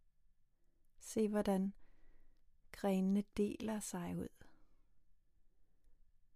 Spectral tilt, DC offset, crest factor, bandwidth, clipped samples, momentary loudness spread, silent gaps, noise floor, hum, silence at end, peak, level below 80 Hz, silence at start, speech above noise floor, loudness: -6.5 dB/octave; under 0.1%; 18 dB; 15.5 kHz; under 0.1%; 12 LU; none; -71 dBFS; none; 0.4 s; -24 dBFS; -66 dBFS; 1 s; 33 dB; -40 LUFS